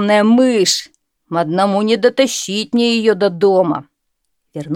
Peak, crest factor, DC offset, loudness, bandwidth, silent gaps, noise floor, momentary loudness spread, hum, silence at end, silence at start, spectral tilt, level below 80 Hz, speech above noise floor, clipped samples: 0 dBFS; 14 dB; under 0.1%; -14 LUFS; 16.5 kHz; none; -72 dBFS; 10 LU; none; 0 s; 0 s; -4 dB/octave; -66 dBFS; 58 dB; under 0.1%